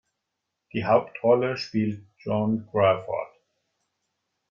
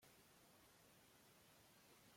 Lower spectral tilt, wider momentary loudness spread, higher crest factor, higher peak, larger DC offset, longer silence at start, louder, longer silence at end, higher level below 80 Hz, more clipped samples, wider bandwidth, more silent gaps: first, -7.5 dB/octave vs -2.5 dB/octave; first, 11 LU vs 1 LU; first, 20 dB vs 14 dB; first, -6 dBFS vs -58 dBFS; neither; first, 0.75 s vs 0 s; first, -25 LUFS vs -69 LUFS; first, 1.25 s vs 0 s; first, -66 dBFS vs -90 dBFS; neither; second, 7.2 kHz vs 16.5 kHz; neither